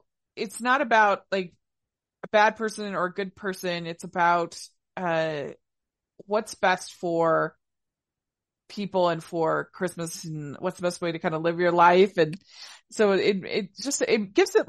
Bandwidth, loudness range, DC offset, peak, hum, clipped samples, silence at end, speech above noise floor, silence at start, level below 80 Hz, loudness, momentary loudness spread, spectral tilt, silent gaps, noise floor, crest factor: 12.5 kHz; 5 LU; under 0.1%; -6 dBFS; none; under 0.1%; 0.05 s; 63 dB; 0.35 s; -70 dBFS; -25 LUFS; 15 LU; -4.5 dB/octave; none; -88 dBFS; 20 dB